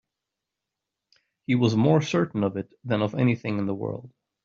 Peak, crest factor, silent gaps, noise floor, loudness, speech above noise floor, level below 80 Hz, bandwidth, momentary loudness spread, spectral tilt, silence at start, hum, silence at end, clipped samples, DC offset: -8 dBFS; 20 dB; none; -86 dBFS; -25 LUFS; 62 dB; -64 dBFS; 7.4 kHz; 13 LU; -6.5 dB/octave; 1.5 s; none; 0.35 s; under 0.1%; under 0.1%